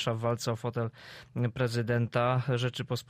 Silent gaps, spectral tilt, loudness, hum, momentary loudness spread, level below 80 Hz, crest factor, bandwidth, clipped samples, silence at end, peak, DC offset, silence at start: none; -6 dB/octave; -31 LUFS; none; 9 LU; -62 dBFS; 16 dB; 15 kHz; under 0.1%; 0.05 s; -16 dBFS; under 0.1%; 0 s